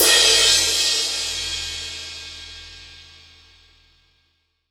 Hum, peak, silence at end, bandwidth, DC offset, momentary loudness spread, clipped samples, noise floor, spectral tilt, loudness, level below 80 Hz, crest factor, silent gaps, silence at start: none; 0 dBFS; 1.65 s; over 20 kHz; under 0.1%; 25 LU; under 0.1%; -68 dBFS; 1 dB/octave; -16 LUFS; -48 dBFS; 22 dB; none; 0 s